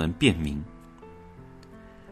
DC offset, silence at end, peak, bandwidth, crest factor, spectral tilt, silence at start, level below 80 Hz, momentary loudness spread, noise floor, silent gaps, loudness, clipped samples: under 0.1%; 0 s; -6 dBFS; 13.5 kHz; 24 dB; -5.5 dB/octave; 0 s; -46 dBFS; 25 LU; -48 dBFS; none; -26 LUFS; under 0.1%